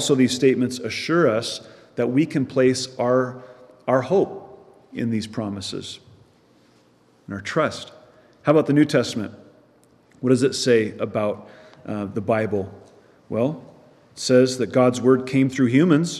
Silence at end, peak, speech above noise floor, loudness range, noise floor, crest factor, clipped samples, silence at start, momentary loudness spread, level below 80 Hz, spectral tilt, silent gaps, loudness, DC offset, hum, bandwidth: 0 s; -4 dBFS; 37 dB; 8 LU; -57 dBFS; 18 dB; under 0.1%; 0 s; 17 LU; -68 dBFS; -5.5 dB/octave; none; -21 LUFS; under 0.1%; none; 12.5 kHz